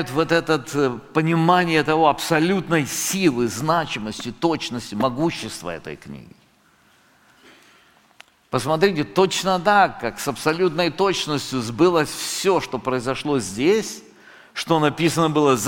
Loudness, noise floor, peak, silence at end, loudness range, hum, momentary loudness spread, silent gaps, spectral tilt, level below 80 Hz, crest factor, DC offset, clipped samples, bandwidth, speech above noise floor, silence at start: -20 LUFS; -57 dBFS; -2 dBFS; 0 s; 9 LU; none; 12 LU; none; -4.5 dB/octave; -52 dBFS; 18 dB; under 0.1%; under 0.1%; 17 kHz; 37 dB; 0 s